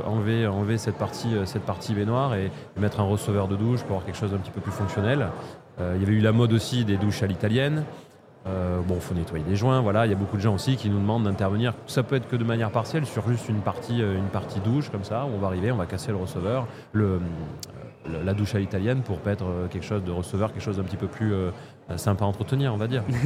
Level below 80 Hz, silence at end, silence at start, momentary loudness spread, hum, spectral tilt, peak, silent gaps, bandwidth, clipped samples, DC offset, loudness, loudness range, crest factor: -50 dBFS; 0 s; 0 s; 7 LU; none; -7 dB/octave; -8 dBFS; none; 14.5 kHz; under 0.1%; under 0.1%; -26 LUFS; 4 LU; 18 dB